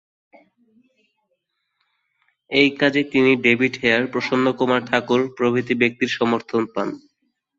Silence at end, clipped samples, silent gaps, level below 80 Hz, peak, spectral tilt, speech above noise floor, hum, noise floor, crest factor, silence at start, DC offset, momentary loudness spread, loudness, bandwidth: 0.6 s; under 0.1%; none; -62 dBFS; -2 dBFS; -5.5 dB/octave; 54 dB; none; -73 dBFS; 20 dB; 2.5 s; under 0.1%; 7 LU; -19 LUFS; 7.6 kHz